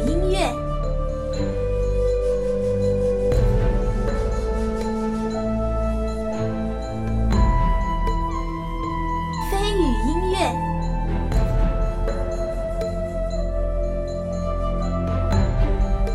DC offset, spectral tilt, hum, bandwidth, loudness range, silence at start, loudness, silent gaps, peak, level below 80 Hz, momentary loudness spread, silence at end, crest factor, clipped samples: under 0.1%; -7 dB/octave; none; 12 kHz; 3 LU; 0 s; -24 LUFS; none; -6 dBFS; -24 dBFS; 6 LU; 0 s; 14 dB; under 0.1%